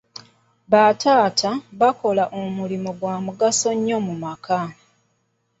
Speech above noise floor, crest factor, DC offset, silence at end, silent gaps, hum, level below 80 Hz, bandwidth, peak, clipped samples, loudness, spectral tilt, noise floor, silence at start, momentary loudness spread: 49 dB; 18 dB; under 0.1%; 0.9 s; none; none; -64 dBFS; 8.2 kHz; -2 dBFS; under 0.1%; -20 LUFS; -4 dB/octave; -69 dBFS; 0.7 s; 12 LU